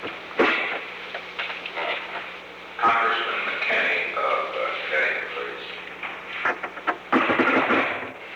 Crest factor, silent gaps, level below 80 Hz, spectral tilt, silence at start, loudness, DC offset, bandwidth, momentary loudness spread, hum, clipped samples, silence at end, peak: 18 dB; none; -66 dBFS; -4 dB/octave; 0 s; -24 LUFS; under 0.1%; 19.5 kHz; 13 LU; 60 Hz at -60 dBFS; under 0.1%; 0 s; -8 dBFS